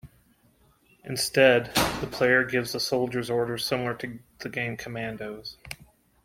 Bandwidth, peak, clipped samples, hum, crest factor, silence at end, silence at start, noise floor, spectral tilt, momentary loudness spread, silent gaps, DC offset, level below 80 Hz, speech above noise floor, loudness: 16.5 kHz; -6 dBFS; under 0.1%; none; 22 dB; 0.5 s; 0.05 s; -63 dBFS; -4 dB/octave; 19 LU; none; under 0.1%; -54 dBFS; 36 dB; -26 LUFS